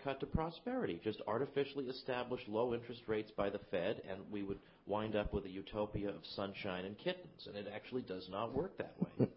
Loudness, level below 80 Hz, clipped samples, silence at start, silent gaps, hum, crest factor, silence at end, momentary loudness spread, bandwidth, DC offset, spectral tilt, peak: -42 LUFS; -60 dBFS; under 0.1%; 0 s; none; none; 22 dB; 0 s; 7 LU; 5.6 kHz; under 0.1%; -5 dB/octave; -20 dBFS